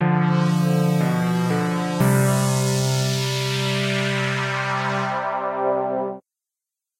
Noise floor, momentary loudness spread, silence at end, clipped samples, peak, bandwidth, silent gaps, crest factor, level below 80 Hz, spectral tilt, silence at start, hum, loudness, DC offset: -87 dBFS; 5 LU; 0.8 s; under 0.1%; -6 dBFS; 16.5 kHz; none; 14 dB; -60 dBFS; -5.5 dB/octave; 0 s; none; -21 LUFS; under 0.1%